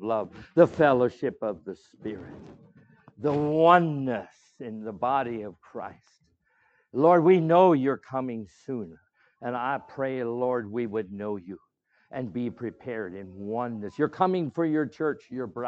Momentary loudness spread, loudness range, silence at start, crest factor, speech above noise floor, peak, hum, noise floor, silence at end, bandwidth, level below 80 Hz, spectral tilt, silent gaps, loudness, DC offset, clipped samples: 20 LU; 9 LU; 0 s; 22 dB; 42 dB; -4 dBFS; none; -68 dBFS; 0 s; 7.8 kHz; -68 dBFS; -8.5 dB/octave; none; -26 LUFS; under 0.1%; under 0.1%